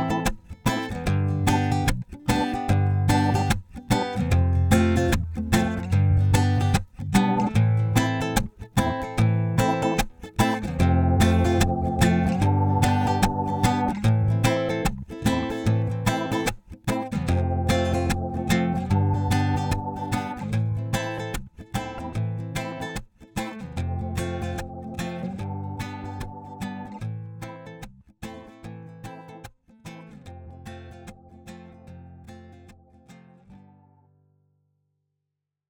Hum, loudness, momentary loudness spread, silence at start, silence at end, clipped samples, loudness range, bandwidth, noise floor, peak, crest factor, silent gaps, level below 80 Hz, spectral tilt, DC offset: none; -24 LUFS; 20 LU; 0 s; 2.15 s; under 0.1%; 20 LU; 19.5 kHz; -83 dBFS; -4 dBFS; 20 dB; none; -38 dBFS; -6 dB/octave; under 0.1%